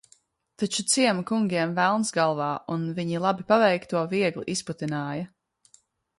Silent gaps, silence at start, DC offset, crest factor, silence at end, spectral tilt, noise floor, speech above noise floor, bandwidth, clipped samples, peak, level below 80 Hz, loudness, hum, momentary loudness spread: none; 0.6 s; under 0.1%; 20 dB; 0.95 s; -4 dB/octave; -63 dBFS; 38 dB; 11.5 kHz; under 0.1%; -8 dBFS; -68 dBFS; -25 LUFS; none; 9 LU